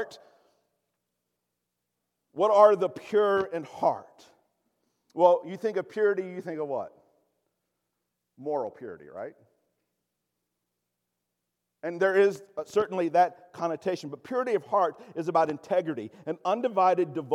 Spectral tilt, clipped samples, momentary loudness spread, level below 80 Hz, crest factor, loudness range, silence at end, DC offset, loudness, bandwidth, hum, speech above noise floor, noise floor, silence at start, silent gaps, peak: -6 dB/octave; under 0.1%; 16 LU; -78 dBFS; 22 dB; 14 LU; 0 s; under 0.1%; -27 LUFS; 12 kHz; 60 Hz at -70 dBFS; 57 dB; -83 dBFS; 0 s; none; -6 dBFS